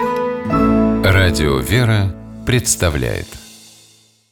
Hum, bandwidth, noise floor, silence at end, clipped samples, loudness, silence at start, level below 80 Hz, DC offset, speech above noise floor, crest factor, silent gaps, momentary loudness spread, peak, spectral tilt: none; 18.5 kHz; -50 dBFS; 0.75 s; under 0.1%; -16 LUFS; 0 s; -30 dBFS; under 0.1%; 35 dB; 14 dB; none; 12 LU; -2 dBFS; -5 dB/octave